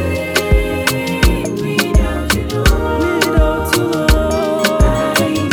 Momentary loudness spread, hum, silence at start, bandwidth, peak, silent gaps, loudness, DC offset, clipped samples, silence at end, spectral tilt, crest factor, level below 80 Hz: 3 LU; none; 0 s; over 20 kHz; 0 dBFS; none; -15 LUFS; under 0.1%; under 0.1%; 0 s; -5 dB/octave; 14 dB; -18 dBFS